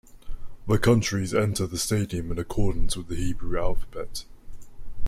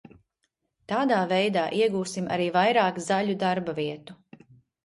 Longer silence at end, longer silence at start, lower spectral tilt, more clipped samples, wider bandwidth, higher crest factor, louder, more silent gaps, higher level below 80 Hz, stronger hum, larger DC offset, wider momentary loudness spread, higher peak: second, 0 s vs 0.7 s; second, 0.15 s vs 0.9 s; about the same, -5.5 dB/octave vs -5 dB/octave; neither; first, 15 kHz vs 11.5 kHz; about the same, 16 dB vs 18 dB; about the same, -27 LUFS vs -25 LUFS; neither; first, -34 dBFS vs -68 dBFS; neither; neither; first, 17 LU vs 9 LU; about the same, -8 dBFS vs -8 dBFS